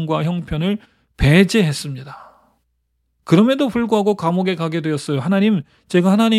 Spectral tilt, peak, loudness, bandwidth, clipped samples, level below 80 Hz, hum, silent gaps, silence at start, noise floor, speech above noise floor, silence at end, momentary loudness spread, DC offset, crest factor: -6.5 dB/octave; 0 dBFS; -17 LUFS; 13.5 kHz; under 0.1%; -38 dBFS; none; none; 0 s; -68 dBFS; 52 dB; 0 s; 10 LU; under 0.1%; 16 dB